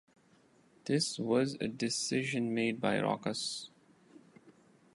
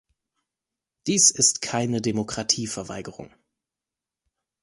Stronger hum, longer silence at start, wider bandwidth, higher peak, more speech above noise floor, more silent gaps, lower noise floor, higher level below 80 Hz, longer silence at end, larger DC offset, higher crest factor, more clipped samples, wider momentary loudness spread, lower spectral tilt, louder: neither; second, 0.85 s vs 1.05 s; about the same, 11.5 kHz vs 11.5 kHz; second, -14 dBFS vs -4 dBFS; second, 33 dB vs 65 dB; neither; second, -66 dBFS vs -89 dBFS; second, -76 dBFS vs -60 dBFS; second, 0.45 s vs 1.35 s; neither; about the same, 20 dB vs 22 dB; neither; second, 7 LU vs 19 LU; first, -4 dB/octave vs -2.5 dB/octave; second, -33 LUFS vs -21 LUFS